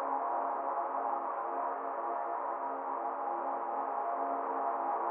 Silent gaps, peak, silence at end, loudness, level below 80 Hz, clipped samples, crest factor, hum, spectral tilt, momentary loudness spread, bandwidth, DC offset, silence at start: none; -22 dBFS; 0 s; -35 LUFS; under -90 dBFS; under 0.1%; 12 dB; none; 4.5 dB/octave; 3 LU; 3.4 kHz; under 0.1%; 0 s